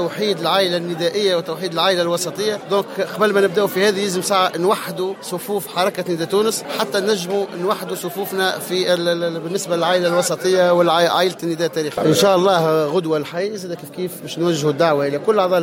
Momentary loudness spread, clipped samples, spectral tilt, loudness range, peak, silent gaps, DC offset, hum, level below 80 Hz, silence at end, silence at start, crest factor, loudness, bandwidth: 9 LU; under 0.1%; -4 dB/octave; 4 LU; -4 dBFS; none; under 0.1%; none; -68 dBFS; 0 s; 0 s; 14 dB; -18 LUFS; 17 kHz